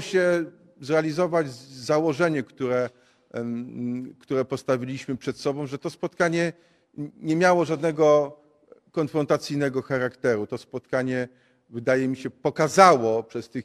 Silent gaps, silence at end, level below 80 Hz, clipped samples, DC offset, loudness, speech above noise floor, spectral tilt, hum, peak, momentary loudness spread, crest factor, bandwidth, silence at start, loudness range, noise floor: none; 0 s; -66 dBFS; under 0.1%; under 0.1%; -24 LUFS; 32 dB; -5.5 dB/octave; none; 0 dBFS; 14 LU; 24 dB; 13.5 kHz; 0 s; 5 LU; -56 dBFS